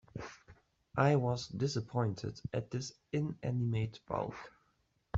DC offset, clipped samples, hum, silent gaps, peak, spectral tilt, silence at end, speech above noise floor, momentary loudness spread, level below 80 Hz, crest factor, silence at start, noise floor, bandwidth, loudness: under 0.1%; under 0.1%; none; none; -16 dBFS; -6.5 dB/octave; 0 s; 41 dB; 17 LU; -64 dBFS; 20 dB; 0.15 s; -76 dBFS; 7.8 kHz; -36 LUFS